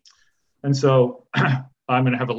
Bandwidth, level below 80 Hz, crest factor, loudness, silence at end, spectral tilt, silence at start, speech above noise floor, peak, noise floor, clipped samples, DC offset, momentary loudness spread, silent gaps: 7.8 kHz; -64 dBFS; 16 dB; -21 LUFS; 0 s; -7 dB/octave; 0.65 s; 45 dB; -4 dBFS; -65 dBFS; under 0.1%; under 0.1%; 8 LU; none